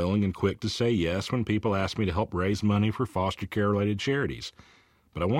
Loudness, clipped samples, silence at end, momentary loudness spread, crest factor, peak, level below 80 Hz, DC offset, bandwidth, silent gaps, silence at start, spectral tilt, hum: -28 LUFS; under 0.1%; 0 s; 5 LU; 16 dB; -12 dBFS; -50 dBFS; under 0.1%; 13.5 kHz; none; 0 s; -6.5 dB/octave; none